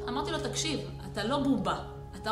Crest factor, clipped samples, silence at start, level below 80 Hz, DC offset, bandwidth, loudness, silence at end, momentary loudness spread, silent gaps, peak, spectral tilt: 16 dB; under 0.1%; 0 s; -48 dBFS; under 0.1%; 13.5 kHz; -32 LUFS; 0 s; 10 LU; none; -16 dBFS; -4.5 dB/octave